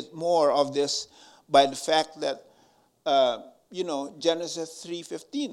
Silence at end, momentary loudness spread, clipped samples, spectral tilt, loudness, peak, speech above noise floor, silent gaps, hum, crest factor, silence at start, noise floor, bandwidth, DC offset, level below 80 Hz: 0 s; 15 LU; under 0.1%; -3 dB/octave; -26 LUFS; -4 dBFS; 36 dB; none; none; 22 dB; 0 s; -62 dBFS; 13 kHz; under 0.1%; -76 dBFS